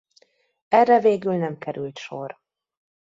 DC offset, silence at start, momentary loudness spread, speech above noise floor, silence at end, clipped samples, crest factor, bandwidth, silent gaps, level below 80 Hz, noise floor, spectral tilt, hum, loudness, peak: under 0.1%; 0.7 s; 17 LU; 41 dB; 0.8 s; under 0.1%; 20 dB; 7.8 kHz; none; -72 dBFS; -61 dBFS; -7 dB/octave; none; -21 LUFS; -4 dBFS